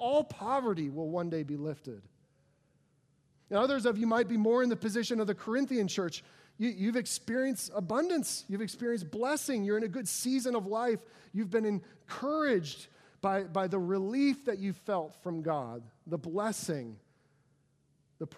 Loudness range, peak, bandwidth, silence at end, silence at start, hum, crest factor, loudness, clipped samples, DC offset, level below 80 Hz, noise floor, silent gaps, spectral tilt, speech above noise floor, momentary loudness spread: 6 LU; -14 dBFS; 15.5 kHz; 0 s; 0 s; none; 18 dB; -33 LUFS; under 0.1%; under 0.1%; -78 dBFS; -71 dBFS; none; -5 dB/octave; 39 dB; 10 LU